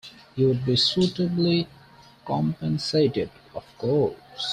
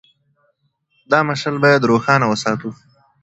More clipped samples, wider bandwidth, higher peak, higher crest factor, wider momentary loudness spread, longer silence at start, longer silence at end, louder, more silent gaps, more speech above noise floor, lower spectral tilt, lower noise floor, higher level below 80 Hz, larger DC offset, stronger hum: neither; first, 10.5 kHz vs 8.2 kHz; second, -10 dBFS vs 0 dBFS; about the same, 16 dB vs 18 dB; first, 15 LU vs 9 LU; second, 0.05 s vs 1.1 s; second, 0 s vs 0.5 s; second, -24 LUFS vs -16 LUFS; neither; second, 27 dB vs 49 dB; about the same, -6.5 dB/octave vs -5.5 dB/octave; second, -51 dBFS vs -65 dBFS; about the same, -56 dBFS vs -58 dBFS; neither; neither